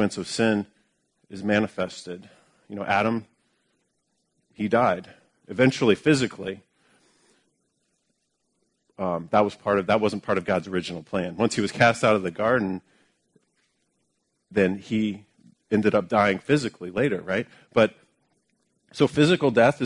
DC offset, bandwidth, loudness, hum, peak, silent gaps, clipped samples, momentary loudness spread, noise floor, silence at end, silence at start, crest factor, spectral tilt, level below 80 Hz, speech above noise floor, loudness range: under 0.1%; 11 kHz; -24 LUFS; none; -4 dBFS; none; under 0.1%; 15 LU; -74 dBFS; 0 s; 0 s; 22 dB; -5.5 dB/octave; -62 dBFS; 51 dB; 5 LU